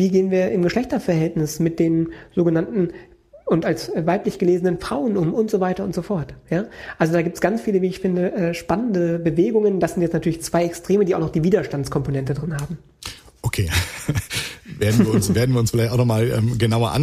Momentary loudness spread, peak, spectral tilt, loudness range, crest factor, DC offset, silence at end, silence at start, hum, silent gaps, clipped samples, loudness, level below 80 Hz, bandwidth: 8 LU; -4 dBFS; -6.5 dB/octave; 3 LU; 18 dB; under 0.1%; 0 s; 0 s; none; none; under 0.1%; -21 LUFS; -44 dBFS; 15.5 kHz